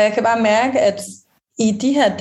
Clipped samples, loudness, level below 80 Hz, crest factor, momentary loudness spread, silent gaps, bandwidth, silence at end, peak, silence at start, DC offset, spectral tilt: under 0.1%; -16 LUFS; -64 dBFS; 14 dB; 16 LU; none; 12.5 kHz; 0 s; -2 dBFS; 0 s; under 0.1%; -4.5 dB/octave